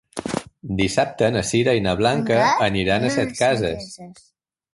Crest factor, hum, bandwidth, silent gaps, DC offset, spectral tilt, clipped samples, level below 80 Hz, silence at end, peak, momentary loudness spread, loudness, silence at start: 16 dB; none; 11.5 kHz; none; under 0.1%; -5 dB/octave; under 0.1%; -46 dBFS; 0.65 s; -4 dBFS; 11 LU; -20 LUFS; 0.15 s